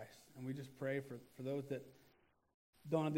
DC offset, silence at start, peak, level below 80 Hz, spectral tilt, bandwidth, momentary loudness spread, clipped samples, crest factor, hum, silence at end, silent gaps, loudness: under 0.1%; 0 s; -24 dBFS; -82 dBFS; -7.5 dB/octave; 16 kHz; 15 LU; under 0.1%; 20 dB; none; 0 s; 2.54-2.73 s; -45 LUFS